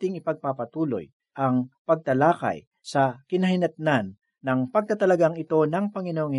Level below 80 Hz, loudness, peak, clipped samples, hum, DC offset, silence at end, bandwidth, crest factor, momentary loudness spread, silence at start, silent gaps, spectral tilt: -70 dBFS; -25 LUFS; -6 dBFS; under 0.1%; none; under 0.1%; 0 s; 11.5 kHz; 18 dB; 9 LU; 0 s; 1.13-1.20 s, 1.78-1.85 s, 2.67-2.71 s; -7.5 dB/octave